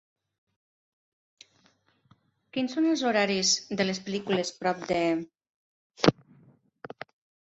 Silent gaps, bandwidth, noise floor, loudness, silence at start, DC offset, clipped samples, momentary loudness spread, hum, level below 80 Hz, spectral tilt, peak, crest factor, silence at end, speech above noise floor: 5.50-5.90 s; 8.2 kHz; -66 dBFS; -27 LUFS; 2.55 s; under 0.1%; under 0.1%; 21 LU; none; -66 dBFS; -3.5 dB/octave; -2 dBFS; 28 dB; 0.6 s; 39 dB